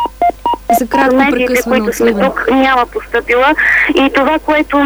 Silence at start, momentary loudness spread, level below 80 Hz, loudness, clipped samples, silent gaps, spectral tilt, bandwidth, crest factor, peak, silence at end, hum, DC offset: 0 s; 5 LU; -36 dBFS; -11 LUFS; under 0.1%; none; -4 dB/octave; over 20 kHz; 12 dB; 0 dBFS; 0 s; none; under 0.1%